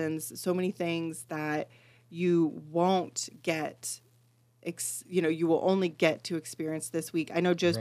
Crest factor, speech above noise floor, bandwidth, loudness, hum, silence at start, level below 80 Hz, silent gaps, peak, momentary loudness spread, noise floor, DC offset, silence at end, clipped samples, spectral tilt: 20 dB; 35 dB; 15 kHz; -30 LUFS; none; 0 s; -80 dBFS; none; -10 dBFS; 10 LU; -65 dBFS; under 0.1%; 0 s; under 0.1%; -5 dB/octave